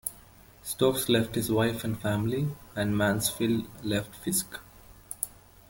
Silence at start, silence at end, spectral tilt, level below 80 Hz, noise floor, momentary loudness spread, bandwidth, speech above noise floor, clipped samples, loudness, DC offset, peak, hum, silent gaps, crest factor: 0.05 s; 0.4 s; -4.5 dB/octave; -54 dBFS; -54 dBFS; 11 LU; 17 kHz; 25 dB; under 0.1%; -29 LUFS; under 0.1%; -10 dBFS; none; none; 20 dB